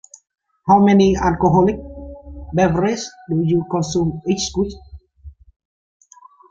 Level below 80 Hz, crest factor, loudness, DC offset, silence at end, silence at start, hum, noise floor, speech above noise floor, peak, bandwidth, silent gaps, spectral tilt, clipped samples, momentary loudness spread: -40 dBFS; 18 dB; -17 LUFS; under 0.1%; 1.2 s; 0.65 s; none; -42 dBFS; 26 dB; -2 dBFS; 7.8 kHz; none; -6 dB/octave; under 0.1%; 17 LU